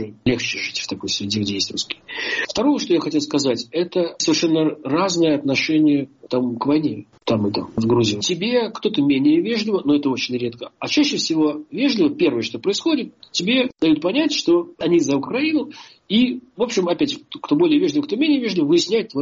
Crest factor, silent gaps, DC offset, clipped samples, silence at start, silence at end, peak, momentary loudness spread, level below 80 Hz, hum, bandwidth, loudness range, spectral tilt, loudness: 14 dB; none; under 0.1%; under 0.1%; 0 s; 0 s; -6 dBFS; 6 LU; -58 dBFS; none; 7.6 kHz; 2 LU; -4 dB/octave; -20 LUFS